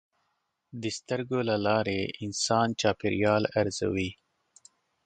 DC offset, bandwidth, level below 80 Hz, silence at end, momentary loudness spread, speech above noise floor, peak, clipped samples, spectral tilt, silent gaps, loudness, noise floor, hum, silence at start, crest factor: under 0.1%; 9.4 kHz; -56 dBFS; 0.9 s; 10 LU; 50 dB; -10 dBFS; under 0.1%; -4.5 dB/octave; none; -28 LUFS; -78 dBFS; none; 0.75 s; 20 dB